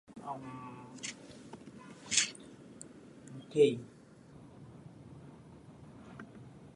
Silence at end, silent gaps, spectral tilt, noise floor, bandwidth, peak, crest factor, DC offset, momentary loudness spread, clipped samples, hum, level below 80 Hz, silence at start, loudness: 0 s; none; -3 dB/octave; -56 dBFS; 11.5 kHz; -10 dBFS; 30 dB; under 0.1%; 25 LU; under 0.1%; none; -70 dBFS; 0.1 s; -34 LUFS